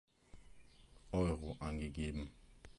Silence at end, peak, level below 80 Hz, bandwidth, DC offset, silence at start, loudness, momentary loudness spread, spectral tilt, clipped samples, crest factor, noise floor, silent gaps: 0.05 s; -24 dBFS; -52 dBFS; 11.5 kHz; under 0.1%; 0.35 s; -42 LUFS; 12 LU; -7 dB/octave; under 0.1%; 18 dB; -62 dBFS; none